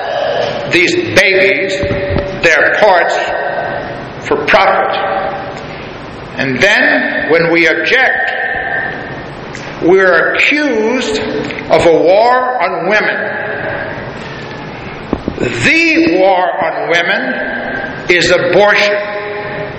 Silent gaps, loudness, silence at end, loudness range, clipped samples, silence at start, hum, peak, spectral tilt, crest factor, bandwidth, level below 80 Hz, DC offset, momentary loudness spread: none; -11 LUFS; 0 s; 4 LU; 0.2%; 0 s; none; 0 dBFS; -4.5 dB/octave; 12 dB; 13 kHz; -38 dBFS; under 0.1%; 15 LU